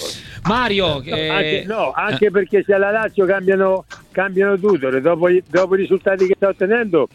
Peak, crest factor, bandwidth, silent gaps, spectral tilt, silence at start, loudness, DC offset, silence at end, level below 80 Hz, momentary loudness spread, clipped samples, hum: -2 dBFS; 14 dB; 12 kHz; none; -5.5 dB/octave; 0 s; -17 LUFS; under 0.1%; 0.1 s; -46 dBFS; 5 LU; under 0.1%; none